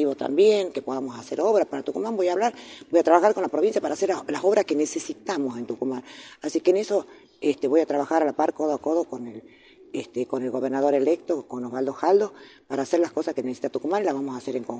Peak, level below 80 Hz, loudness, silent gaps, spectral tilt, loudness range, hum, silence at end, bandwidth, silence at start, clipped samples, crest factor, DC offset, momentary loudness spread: -4 dBFS; -72 dBFS; -24 LUFS; none; -5 dB/octave; 3 LU; none; 0 s; 9.6 kHz; 0 s; under 0.1%; 20 dB; under 0.1%; 11 LU